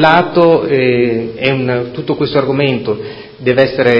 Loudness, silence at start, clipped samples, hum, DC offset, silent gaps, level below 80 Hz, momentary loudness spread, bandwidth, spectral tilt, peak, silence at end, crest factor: -13 LUFS; 0 s; 0.2%; none; under 0.1%; none; -46 dBFS; 9 LU; 6.6 kHz; -8 dB/octave; 0 dBFS; 0 s; 12 dB